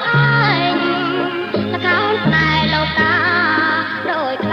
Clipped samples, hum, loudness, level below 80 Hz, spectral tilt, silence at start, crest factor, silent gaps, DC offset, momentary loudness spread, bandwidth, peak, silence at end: under 0.1%; none; -15 LUFS; -42 dBFS; -7 dB/octave; 0 s; 14 dB; none; under 0.1%; 6 LU; 6.6 kHz; -2 dBFS; 0 s